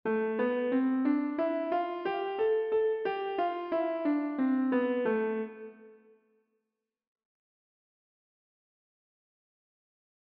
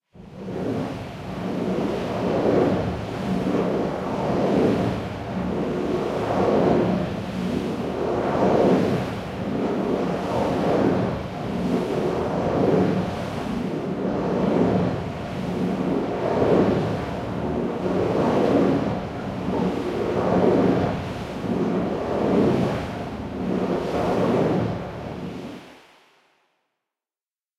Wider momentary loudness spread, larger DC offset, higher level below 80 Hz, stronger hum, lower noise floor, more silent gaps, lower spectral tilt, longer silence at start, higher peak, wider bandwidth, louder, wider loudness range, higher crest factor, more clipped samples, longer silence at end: second, 5 LU vs 10 LU; neither; second, -80 dBFS vs -46 dBFS; neither; second, -86 dBFS vs under -90 dBFS; neither; second, -4 dB/octave vs -7.5 dB/octave; about the same, 0.05 s vs 0.15 s; second, -18 dBFS vs -6 dBFS; second, 5.2 kHz vs 13 kHz; second, -30 LUFS vs -24 LUFS; first, 7 LU vs 3 LU; about the same, 14 dB vs 18 dB; neither; first, 4.45 s vs 1.85 s